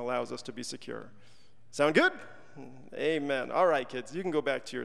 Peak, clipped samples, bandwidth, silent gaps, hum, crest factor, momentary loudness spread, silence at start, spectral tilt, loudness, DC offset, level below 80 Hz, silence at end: -10 dBFS; under 0.1%; 12.5 kHz; none; none; 22 dB; 21 LU; 0 s; -4.5 dB/octave; -30 LUFS; 0.4%; -76 dBFS; 0 s